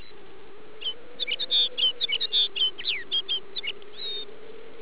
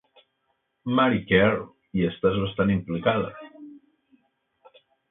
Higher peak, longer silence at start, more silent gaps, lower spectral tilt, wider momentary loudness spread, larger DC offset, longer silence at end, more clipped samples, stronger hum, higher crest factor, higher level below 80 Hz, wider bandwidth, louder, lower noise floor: second, -14 dBFS vs -6 dBFS; second, 0 s vs 0.85 s; neither; second, 2.5 dB/octave vs -11 dB/octave; about the same, 13 LU vs 14 LU; first, 2% vs under 0.1%; second, 0 s vs 1.35 s; neither; neither; second, 14 dB vs 20 dB; second, -68 dBFS vs -50 dBFS; about the same, 4 kHz vs 4 kHz; about the same, -24 LUFS vs -24 LUFS; second, -48 dBFS vs -74 dBFS